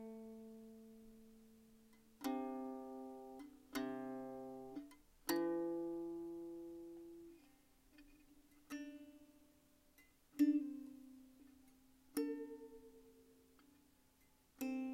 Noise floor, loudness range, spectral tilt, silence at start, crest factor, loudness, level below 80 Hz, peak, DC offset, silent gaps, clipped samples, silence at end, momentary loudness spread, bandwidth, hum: -73 dBFS; 11 LU; -4.5 dB/octave; 0 s; 24 dB; -46 LUFS; -78 dBFS; -22 dBFS; under 0.1%; none; under 0.1%; 0 s; 25 LU; 16 kHz; none